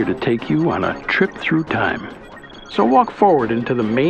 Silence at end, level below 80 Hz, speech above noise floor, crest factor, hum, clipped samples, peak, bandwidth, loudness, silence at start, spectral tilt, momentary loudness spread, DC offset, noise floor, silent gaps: 0 s; -48 dBFS; 20 dB; 18 dB; none; under 0.1%; 0 dBFS; 8.4 kHz; -18 LUFS; 0 s; -7.5 dB/octave; 16 LU; under 0.1%; -38 dBFS; none